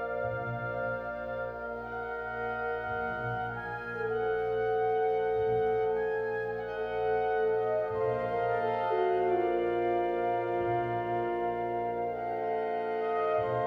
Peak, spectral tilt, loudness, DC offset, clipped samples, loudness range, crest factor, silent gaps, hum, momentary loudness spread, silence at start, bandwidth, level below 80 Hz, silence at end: -18 dBFS; -8.5 dB/octave; -31 LUFS; under 0.1%; under 0.1%; 5 LU; 14 dB; none; 60 Hz at -65 dBFS; 7 LU; 0 s; 5.4 kHz; -58 dBFS; 0 s